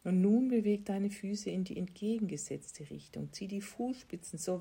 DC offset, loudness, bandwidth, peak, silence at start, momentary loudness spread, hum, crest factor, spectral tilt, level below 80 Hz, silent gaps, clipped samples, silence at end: under 0.1%; -35 LUFS; 16 kHz; -20 dBFS; 0.05 s; 15 LU; none; 16 dB; -6.5 dB/octave; -70 dBFS; none; under 0.1%; 0 s